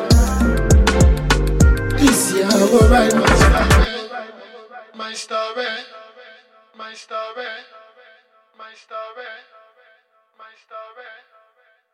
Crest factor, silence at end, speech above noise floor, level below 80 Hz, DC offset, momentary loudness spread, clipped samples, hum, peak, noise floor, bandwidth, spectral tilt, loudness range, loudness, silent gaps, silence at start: 16 dB; 0.85 s; 41 dB; -22 dBFS; under 0.1%; 25 LU; under 0.1%; none; -2 dBFS; -58 dBFS; 16 kHz; -5 dB/octave; 24 LU; -16 LUFS; none; 0 s